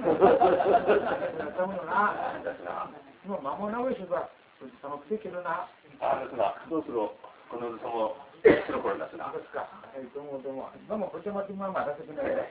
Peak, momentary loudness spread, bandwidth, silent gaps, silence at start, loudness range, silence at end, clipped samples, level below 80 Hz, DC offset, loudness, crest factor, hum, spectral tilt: -6 dBFS; 18 LU; 4 kHz; none; 0 s; 7 LU; 0 s; under 0.1%; -62 dBFS; under 0.1%; -29 LUFS; 22 dB; none; -9.5 dB/octave